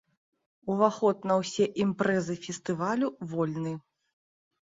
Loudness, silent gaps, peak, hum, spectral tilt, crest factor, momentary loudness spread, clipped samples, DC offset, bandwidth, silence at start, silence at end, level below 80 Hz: -29 LUFS; none; -10 dBFS; none; -6 dB/octave; 20 dB; 10 LU; under 0.1%; under 0.1%; 7.8 kHz; 0.65 s; 0.9 s; -70 dBFS